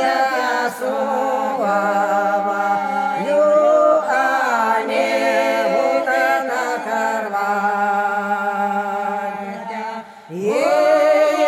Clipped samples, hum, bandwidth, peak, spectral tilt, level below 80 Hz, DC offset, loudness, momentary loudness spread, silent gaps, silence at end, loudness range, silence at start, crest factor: under 0.1%; none; 15.5 kHz; -4 dBFS; -4 dB/octave; -70 dBFS; under 0.1%; -18 LUFS; 9 LU; none; 0 s; 4 LU; 0 s; 14 dB